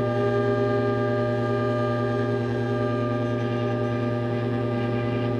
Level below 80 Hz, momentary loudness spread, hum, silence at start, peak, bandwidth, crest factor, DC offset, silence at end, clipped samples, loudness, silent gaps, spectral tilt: -50 dBFS; 3 LU; none; 0 s; -12 dBFS; 6.8 kHz; 12 dB; under 0.1%; 0 s; under 0.1%; -25 LUFS; none; -8.5 dB/octave